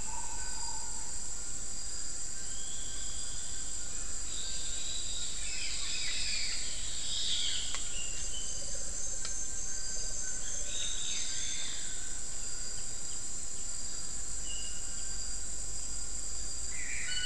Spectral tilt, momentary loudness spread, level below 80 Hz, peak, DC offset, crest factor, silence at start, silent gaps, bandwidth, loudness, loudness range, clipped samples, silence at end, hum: 0 dB/octave; 5 LU; -46 dBFS; -14 dBFS; 3%; 22 dB; 0 s; none; 12 kHz; -36 LUFS; 4 LU; under 0.1%; 0 s; none